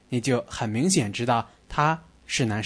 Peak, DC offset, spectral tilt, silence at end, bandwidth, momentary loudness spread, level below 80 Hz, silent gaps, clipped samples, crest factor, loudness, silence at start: -8 dBFS; under 0.1%; -4.5 dB/octave; 0 s; 11 kHz; 7 LU; -52 dBFS; none; under 0.1%; 18 dB; -25 LUFS; 0.1 s